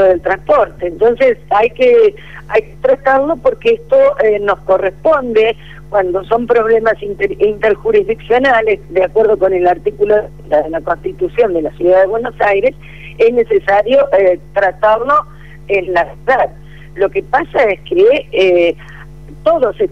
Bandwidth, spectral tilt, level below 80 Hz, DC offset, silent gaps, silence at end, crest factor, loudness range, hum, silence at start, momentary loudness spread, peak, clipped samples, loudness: 7.2 kHz; -6.5 dB/octave; -40 dBFS; 1%; none; 0 s; 10 dB; 2 LU; none; 0 s; 7 LU; -2 dBFS; under 0.1%; -13 LUFS